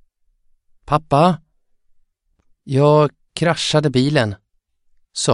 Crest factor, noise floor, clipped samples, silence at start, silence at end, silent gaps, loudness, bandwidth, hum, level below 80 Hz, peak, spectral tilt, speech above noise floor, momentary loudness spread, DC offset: 18 dB; -63 dBFS; under 0.1%; 0.9 s; 0 s; none; -17 LUFS; 11 kHz; none; -50 dBFS; 0 dBFS; -5.5 dB/octave; 47 dB; 11 LU; under 0.1%